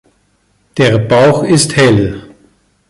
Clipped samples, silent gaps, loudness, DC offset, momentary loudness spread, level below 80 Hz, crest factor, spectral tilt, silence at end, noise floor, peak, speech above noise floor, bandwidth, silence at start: under 0.1%; none; -10 LUFS; under 0.1%; 12 LU; -38 dBFS; 12 dB; -5 dB/octave; 0.65 s; -56 dBFS; 0 dBFS; 47 dB; 11.5 kHz; 0.75 s